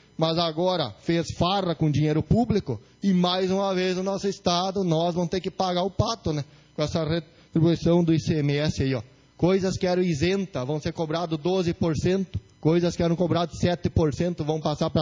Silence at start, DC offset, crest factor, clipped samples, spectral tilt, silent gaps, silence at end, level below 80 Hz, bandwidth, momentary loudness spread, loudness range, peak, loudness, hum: 0.2 s; under 0.1%; 16 dB; under 0.1%; -6.5 dB/octave; none; 0 s; -44 dBFS; 7.6 kHz; 6 LU; 2 LU; -8 dBFS; -25 LUFS; none